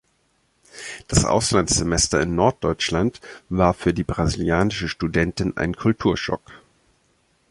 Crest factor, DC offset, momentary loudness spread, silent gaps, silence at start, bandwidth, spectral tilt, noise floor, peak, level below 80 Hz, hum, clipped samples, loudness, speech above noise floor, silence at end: 20 dB; under 0.1%; 10 LU; none; 0.75 s; 11.5 kHz; -4.5 dB/octave; -65 dBFS; -2 dBFS; -36 dBFS; none; under 0.1%; -21 LUFS; 45 dB; 0.95 s